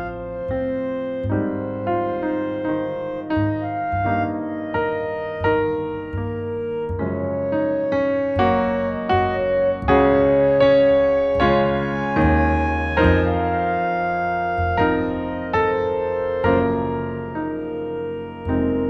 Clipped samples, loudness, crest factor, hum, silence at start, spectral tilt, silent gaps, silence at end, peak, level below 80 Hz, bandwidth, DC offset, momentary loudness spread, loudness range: under 0.1%; -21 LUFS; 18 dB; none; 0 s; -9 dB/octave; none; 0 s; -2 dBFS; -36 dBFS; 6.2 kHz; under 0.1%; 10 LU; 6 LU